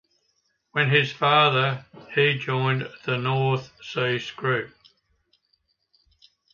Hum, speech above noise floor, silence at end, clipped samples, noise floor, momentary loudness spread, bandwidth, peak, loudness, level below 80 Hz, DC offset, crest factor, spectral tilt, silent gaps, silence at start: none; 48 dB; 1.85 s; under 0.1%; -71 dBFS; 11 LU; 7 kHz; -4 dBFS; -23 LUFS; -66 dBFS; under 0.1%; 20 dB; -6 dB/octave; none; 0.75 s